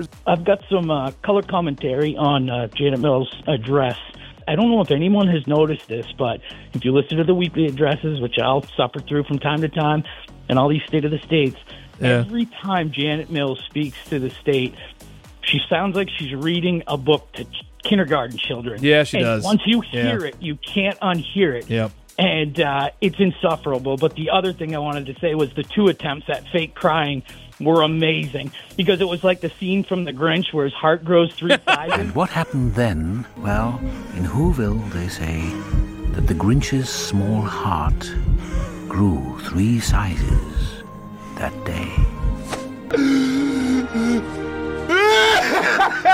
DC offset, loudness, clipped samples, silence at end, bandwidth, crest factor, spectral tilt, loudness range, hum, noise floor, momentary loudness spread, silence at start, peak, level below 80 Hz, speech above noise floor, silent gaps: under 0.1%; -20 LUFS; under 0.1%; 0 s; 16 kHz; 18 dB; -6 dB/octave; 4 LU; none; -40 dBFS; 10 LU; 0 s; -2 dBFS; -32 dBFS; 20 dB; none